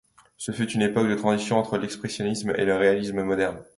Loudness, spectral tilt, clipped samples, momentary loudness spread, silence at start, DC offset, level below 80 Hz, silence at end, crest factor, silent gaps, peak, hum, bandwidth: -25 LUFS; -5.5 dB/octave; under 0.1%; 8 LU; 0.4 s; under 0.1%; -58 dBFS; 0.15 s; 18 dB; none; -6 dBFS; none; 11.5 kHz